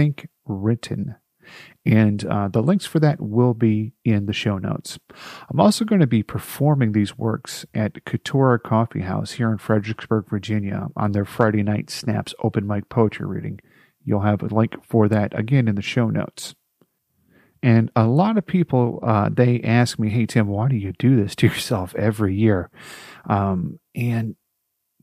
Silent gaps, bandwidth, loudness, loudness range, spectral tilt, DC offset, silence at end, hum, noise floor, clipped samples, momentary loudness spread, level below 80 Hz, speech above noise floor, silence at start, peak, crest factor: none; 15 kHz; -21 LUFS; 4 LU; -7 dB/octave; under 0.1%; 0.7 s; none; -75 dBFS; under 0.1%; 11 LU; -56 dBFS; 55 dB; 0 s; -2 dBFS; 20 dB